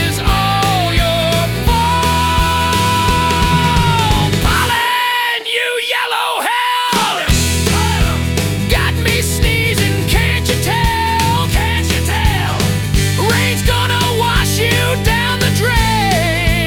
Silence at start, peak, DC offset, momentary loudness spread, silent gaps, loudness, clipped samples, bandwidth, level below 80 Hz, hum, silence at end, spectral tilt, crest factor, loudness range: 0 s; -2 dBFS; under 0.1%; 2 LU; none; -14 LUFS; under 0.1%; 18 kHz; -22 dBFS; none; 0 s; -4 dB/octave; 12 dB; 1 LU